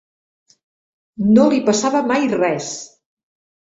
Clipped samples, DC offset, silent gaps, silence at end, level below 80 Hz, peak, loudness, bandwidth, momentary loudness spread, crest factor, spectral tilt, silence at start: under 0.1%; under 0.1%; none; 0.9 s; -58 dBFS; -2 dBFS; -16 LUFS; 8 kHz; 12 LU; 16 dB; -5 dB/octave; 1.2 s